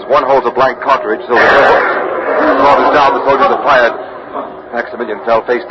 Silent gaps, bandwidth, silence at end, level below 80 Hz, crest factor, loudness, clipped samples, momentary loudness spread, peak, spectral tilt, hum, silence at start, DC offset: none; 7.6 kHz; 0 s; -44 dBFS; 10 dB; -10 LUFS; 0.1%; 13 LU; 0 dBFS; -5 dB/octave; none; 0 s; under 0.1%